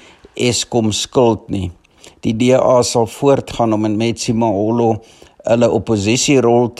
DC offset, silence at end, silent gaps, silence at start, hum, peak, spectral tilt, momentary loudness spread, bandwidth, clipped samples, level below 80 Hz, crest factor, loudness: under 0.1%; 0.1 s; none; 0.35 s; none; 0 dBFS; -5 dB/octave; 12 LU; 13 kHz; under 0.1%; -48 dBFS; 14 dB; -15 LUFS